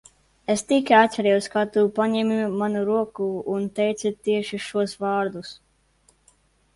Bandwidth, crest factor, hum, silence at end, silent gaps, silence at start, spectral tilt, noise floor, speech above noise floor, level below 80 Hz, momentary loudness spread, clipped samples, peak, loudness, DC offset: 11.5 kHz; 20 dB; none; 1.2 s; none; 0.5 s; -5 dB/octave; -62 dBFS; 40 dB; -64 dBFS; 10 LU; under 0.1%; -4 dBFS; -23 LUFS; under 0.1%